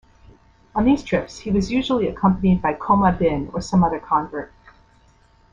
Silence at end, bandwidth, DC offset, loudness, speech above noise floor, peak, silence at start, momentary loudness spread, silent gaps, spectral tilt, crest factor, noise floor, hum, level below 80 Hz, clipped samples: 1.05 s; 7.6 kHz; under 0.1%; -20 LUFS; 35 dB; -4 dBFS; 0.75 s; 9 LU; none; -7 dB/octave; 18 dB; -55 dBFS; none; -40 dBFS; under 0.1%